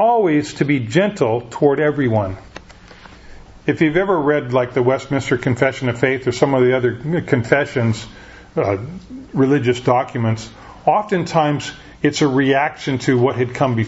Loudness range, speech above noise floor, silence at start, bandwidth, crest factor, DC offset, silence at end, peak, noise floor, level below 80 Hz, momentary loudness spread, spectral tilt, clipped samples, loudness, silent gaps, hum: 2 LU; 24 dB; 0 s; 8 kHz; 18 dB; under 0.1%; 0 s; 0 dBFS; -41 dBFS; -48 dBFS; 9 LU; -6.5 dB/octave; under 0.1%; -18 LUFS; none; none